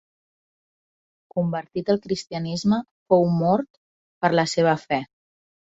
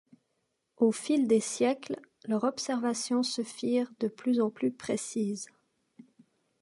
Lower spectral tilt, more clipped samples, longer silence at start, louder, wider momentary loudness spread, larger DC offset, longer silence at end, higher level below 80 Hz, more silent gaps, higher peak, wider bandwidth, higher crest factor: first, -6 dB/octave vs -4.5 dB/octave; neither; first, 1.35 s vs 0.8 s; first, -23 LUFS vs -30 LUFS; about the same, 9 LU vs 8 LU; neither; second, 0.75 s vs 1.15 s; first, -60 dBFS vs -78 dBFS; first, 2.91-3.06 s, 3.70-4.21 s vs none; first, -4 dBFS vs -12 dBFS; second, 7.8 kHz vs 11.5 kHz; about the same, 20 dB vs 18 dB